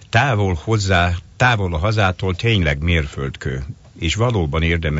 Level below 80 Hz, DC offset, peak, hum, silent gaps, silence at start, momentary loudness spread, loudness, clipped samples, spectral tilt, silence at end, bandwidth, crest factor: -30 dBFS; under 0.1%; -2 dBFS; none; none; 0.15 s; 10 LU; -18 LUFS; under 0.1%; -5.5 dB/octave; 0 s; 8 kHz; 16 dB